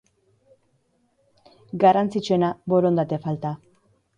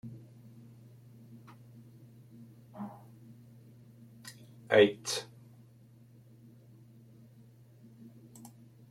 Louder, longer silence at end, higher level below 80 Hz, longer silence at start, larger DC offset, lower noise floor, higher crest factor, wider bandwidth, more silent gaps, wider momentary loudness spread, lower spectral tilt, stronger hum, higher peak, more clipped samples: first, -22 LUFS vs -30 LUFS; second, 0.6 s vs 3.65 s; first, -64 dBFS vs -78 dBFS; first, 1.75 s vs 0.05 s; neither; first, -67 dBFS vs -58 dBFS; second, 20 dB vs 26 dB; second, 9.6 kHz vs 15.5 kHz; neither; second, 14 LU vs 30 LU; first, -7.5 dB/octave vs -4 dB/octave; neither; first, -4 dBFS vs -12 dBFS; neither